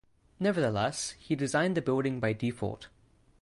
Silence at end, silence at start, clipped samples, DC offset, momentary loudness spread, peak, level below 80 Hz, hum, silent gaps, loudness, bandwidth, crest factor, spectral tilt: 0.55 s; 0.4 s; under 0.1%; under 0.1%; 8 LU; -16 dBFS; -60 dBFS; none; none; -31 LUFS; 11.5 kHz; 16 dB; -5.5 dB/octave